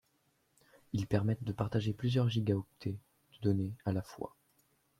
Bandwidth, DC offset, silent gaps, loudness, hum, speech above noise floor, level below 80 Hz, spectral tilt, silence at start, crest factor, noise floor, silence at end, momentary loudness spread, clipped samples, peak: 13.5 kHz; under 0.1%; none; -35 LUFS; none; 42 dB; -64 dBFS; -8 dB/octave; 0.95 s; 20 dB; -75 dBFS; 0.7 s; 12 LU; under 0.1%; -16 dBFS